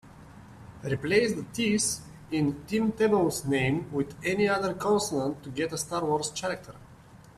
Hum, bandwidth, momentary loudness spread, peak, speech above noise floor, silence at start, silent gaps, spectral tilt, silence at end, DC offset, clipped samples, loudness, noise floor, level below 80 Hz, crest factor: none; 14 kHz; 9 LU; -10 dBFS; 24 dB; 0.05 s; none; -4.5 dB/octave; 0.1 s; under 0.1%; under 0.1%; -28 LUFS; -52 dBFS; -56 dBFS; 18 dB